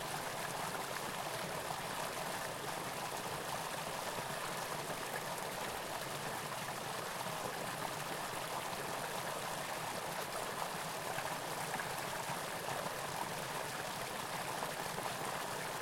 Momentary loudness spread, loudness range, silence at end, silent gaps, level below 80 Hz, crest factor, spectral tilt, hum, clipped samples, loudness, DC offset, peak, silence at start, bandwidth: 1 LU; 1 LU; 0 s; none; -68 dBFS; 18 dB; -2.5 dB/octave; none; under 0.1%; -40 LUFS; under 0.1%; -24 dBFS; 0 s; 16.5 kHz